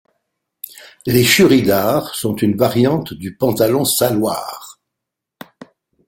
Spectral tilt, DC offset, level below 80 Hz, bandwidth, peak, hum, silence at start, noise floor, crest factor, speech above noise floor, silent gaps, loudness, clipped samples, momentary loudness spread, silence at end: -4.5 dB/octave; under 0.1%; -50 dBFS; 17 kHz; 0 dBFS; none; 0.75 s; -81 dBFS; 18 dB; 66 dB; none; -15 LUFS; under 0.1%; 22 LU; 1.35 s